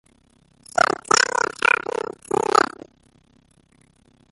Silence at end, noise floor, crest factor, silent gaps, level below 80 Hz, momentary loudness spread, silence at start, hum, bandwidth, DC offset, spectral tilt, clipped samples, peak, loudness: 1.7 s; -58 dBFS; 22 dB; none; -62 dBFS; 9 LU; 0.75 s; none; 12 kHz; under 0.1%; -1.5 dB/octave; under 0.1%; -2 dBFS; -20 LUFS